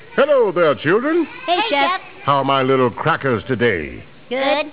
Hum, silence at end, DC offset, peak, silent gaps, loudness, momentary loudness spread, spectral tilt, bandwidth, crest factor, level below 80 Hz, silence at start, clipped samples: none; 0 s; 0.6%; -2 dBFS; none; -17 LUFS; 6 LU; -9.5 dB/octave; 4 kHz; 14 dB; -50 dBFS; 0.1 s; under 0.1%